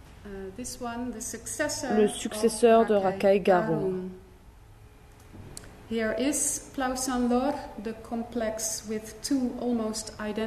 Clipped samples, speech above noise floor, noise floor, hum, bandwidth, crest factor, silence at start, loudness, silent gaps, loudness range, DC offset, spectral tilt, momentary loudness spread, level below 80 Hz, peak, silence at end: under 0.1%; 24 dB; -51 dBFS; none; 13.5 kHz; 20 dB; 0.05 s; -27 LUFS; none; 6 LU; under 0.1%; -4 dB/octave; 15 LU; -52 dBFS; -10 dBFS; 0 s